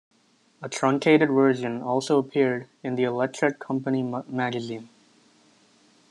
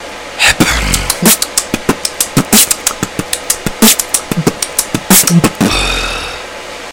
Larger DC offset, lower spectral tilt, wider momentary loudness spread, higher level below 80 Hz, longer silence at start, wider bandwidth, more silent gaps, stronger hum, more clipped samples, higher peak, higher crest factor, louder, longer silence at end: second, under 0.1% vs 0.5%; first, -6 dB/octave vs -2.5 dB/octave; about the same, 13 LU vs 11 LU; second, -74 dBFS vs -28 dBFS; first, 0.6 s vs 0 s; second, 11 kHz vs over 20 kHz; neither; neither; second, under 0.1% vs 1%; second, -6 dBFS vs 0 dBFS; first, 18 dB vs 12 dB; second, -24 LUFS vs -10 LUFS; first, 1.25 s vs 0 s